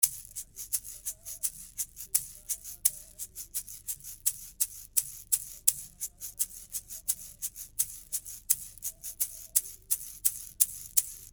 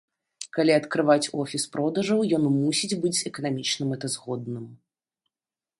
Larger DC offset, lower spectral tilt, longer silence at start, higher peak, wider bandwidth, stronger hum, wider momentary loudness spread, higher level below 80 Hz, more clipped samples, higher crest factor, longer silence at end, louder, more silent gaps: neither; second, 2 dB/octave vs -4.5 dB/octave; second, 0 s vs 0.4 s; first, -2 dBFS vs -6 dBFS; first, over 20 kHz vs 11.5 kHz; neither; about the same, 11 LU vs 11 LU; first, -60 dBFS vs -70 dBFS; neither; first, 32 dB vs 20 dB; second, 0 s vs 1.05 s; second, -31 LUFS vs -25 LUFS; neither